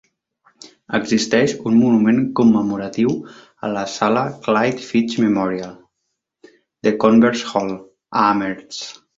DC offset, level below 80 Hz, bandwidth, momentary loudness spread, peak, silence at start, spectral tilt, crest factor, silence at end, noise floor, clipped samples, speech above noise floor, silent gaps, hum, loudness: under 0.1%; -58 dBFS; 7.8 kHz; 13 LU; -2 dBFS; 0.9 s; -5.5 dB/octave; 16 dB; 0.25 s; -76 dBFS; under 0.1%; 59 dB; none; none; -18 LUFS